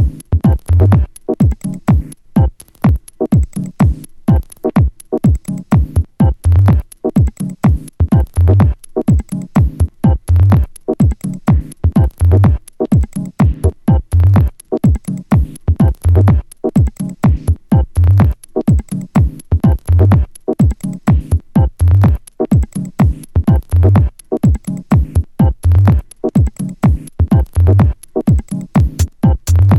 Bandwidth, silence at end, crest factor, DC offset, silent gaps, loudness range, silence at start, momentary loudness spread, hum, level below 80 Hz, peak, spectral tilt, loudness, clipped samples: 12.5 kHz; 0 s; 12 dB; under 0.1%; none; 2 LU; 0 s; 7 LU; none; -18 dBFS; 0 dBFS; -9 dB/octave; -14 LUFS; under 0.1%